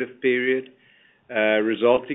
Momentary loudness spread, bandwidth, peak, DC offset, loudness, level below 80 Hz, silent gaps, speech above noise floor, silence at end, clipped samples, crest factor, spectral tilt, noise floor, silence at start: 7 LU; 4 kHz; -4 dBFS; under 0.1%; -22 LUFS; -66 dBFS; none; 36 dB; 0 s; under 0.1%; 18 dB; -8.5 dB/octave; -58 dBFS; 0 s